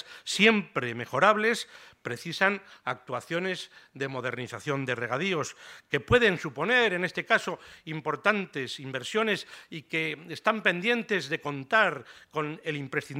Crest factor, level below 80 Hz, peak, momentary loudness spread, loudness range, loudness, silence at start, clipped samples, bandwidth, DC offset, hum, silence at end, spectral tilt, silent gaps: 24 dB; -60 dBFS; -6 dBFS; 14 LU; 5 LU; -28 LUFS; 0.05 s; under 0.1%; 16 kHz; under 0.1%; none; 0 s; -4.5 dB/octave; none